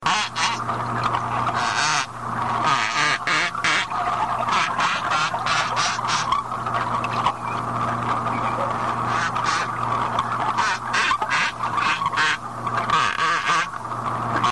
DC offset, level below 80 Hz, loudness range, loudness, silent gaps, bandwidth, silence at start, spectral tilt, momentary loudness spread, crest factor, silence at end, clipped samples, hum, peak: 0.3%; -52 dBFS; 2 LU; -22 LUFS; none; 11.5 kHz; 0 s; -2.5 dB/octave; 5 LU; 16 dB; 0 s; under 0.1%; none; -6 dBFS